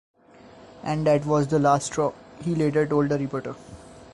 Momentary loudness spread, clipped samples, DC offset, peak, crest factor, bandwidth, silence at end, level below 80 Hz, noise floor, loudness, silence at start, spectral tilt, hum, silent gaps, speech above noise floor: 15 LU; under 0.1%; under 0.1%; -8 dBFS; 18 dB; 11.5 kHz; 0.05 s; -54 dBFS; -49 dBFS; -24 LUFS; 0.55 s; -6.5 dB/octave; none; none; 26 dB